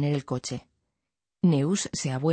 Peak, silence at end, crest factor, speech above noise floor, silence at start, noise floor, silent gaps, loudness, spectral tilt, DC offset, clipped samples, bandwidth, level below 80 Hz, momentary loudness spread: -12 dBFS; 0 s; 16 dB; 61 dB; 0 s; -86 dBFS; none; -27 LUFS; -5.5 dB/octave; under 0.1%; under 0.1%; 9.2 kHz; -62 dBFS; 11 LU